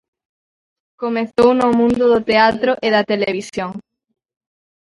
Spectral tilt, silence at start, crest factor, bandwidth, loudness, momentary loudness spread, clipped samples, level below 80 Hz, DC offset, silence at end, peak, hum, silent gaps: -5.5 dB/octave; 1 s; 18 dB; 11.5 kHz; -16 LUFS; 13 LU; under 0.1%; -52 dBFS; under 0.1%; 1.05 s; 0 dBFS; none; none